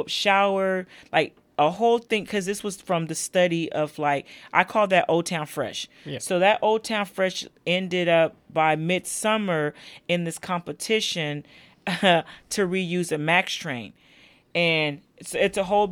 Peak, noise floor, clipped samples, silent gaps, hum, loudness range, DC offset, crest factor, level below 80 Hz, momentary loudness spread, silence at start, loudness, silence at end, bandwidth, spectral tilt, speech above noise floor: -2 dBFS; -55 dBFS; under 0.1%; none; none; 2 LU; under 0.1%; 22 dB; -64 dBFS; 10 LU; 0 s; -24 LUFS; 0 s; over 20 kHz; -4 dB/octave; 31 dB